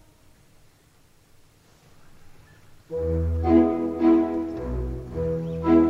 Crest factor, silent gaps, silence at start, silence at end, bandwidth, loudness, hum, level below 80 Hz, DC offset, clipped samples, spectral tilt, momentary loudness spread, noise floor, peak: 18 dB; none; 2.05 s; 0 s; 5.6 kHz; -24 LUFS; none; -38 dBFS; under 0.1%; under 0.1%; -10 dB/octave; 11 LU; -57 dBFS; -6 dBFS